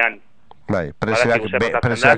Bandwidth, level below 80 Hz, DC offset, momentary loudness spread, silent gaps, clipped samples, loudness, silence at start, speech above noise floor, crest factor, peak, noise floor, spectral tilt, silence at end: 10 kHz; -46 dBFS; 0.8%; 7 LU; none; under 0.1%; -19 LUFS; 0 s; 34 dB; 18 dB; 0 dBFS; -51 dBFS; -5.5 dB/octave; 0 s